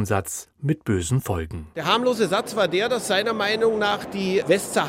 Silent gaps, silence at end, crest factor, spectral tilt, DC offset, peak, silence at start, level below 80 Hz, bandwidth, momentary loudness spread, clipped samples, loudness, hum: none; 0 s; 18 dB; -4.5 dB/octave; under 0.1%; -4 dBFS; 0 s; -48 dBFS; 16 kHz; 8 LU; under 0.1%; -23 LUFS; none